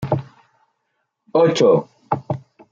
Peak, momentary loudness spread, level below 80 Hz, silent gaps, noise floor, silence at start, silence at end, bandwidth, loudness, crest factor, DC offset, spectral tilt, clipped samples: -4 dBFS; 14 LU; -60 dBFS; none; -73 dBFS; 0 s; 0.3 s; 7.6 kHz; -19 LUFS; 16 dB; under 0.1%; -6.5 dB/octave; under 0.1%